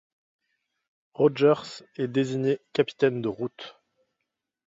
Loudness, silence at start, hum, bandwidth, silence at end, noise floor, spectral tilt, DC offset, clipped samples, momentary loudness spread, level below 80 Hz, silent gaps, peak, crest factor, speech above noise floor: -26 LUFS; 1.2 s; none; 7.8 kHz; 0.95 s; -83 dBFS; -6.5 dB/octave; under 0.1%; under 0.1%; 18 LU; -70 dBFS; none; -8 dBFS; 20 dB; 58 dB